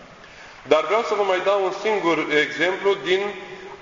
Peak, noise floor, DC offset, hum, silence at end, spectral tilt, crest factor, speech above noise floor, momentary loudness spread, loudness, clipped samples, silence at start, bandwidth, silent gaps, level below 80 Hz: -2 dBFS; -43 dBFS; under 0.1%; none; 0 s; -4 dB/octave; 20 dB; 23 dB; 15 LU; -21 LUFS; under 0.1%; 0 s; 7.6 kHz; none; -60 dBFS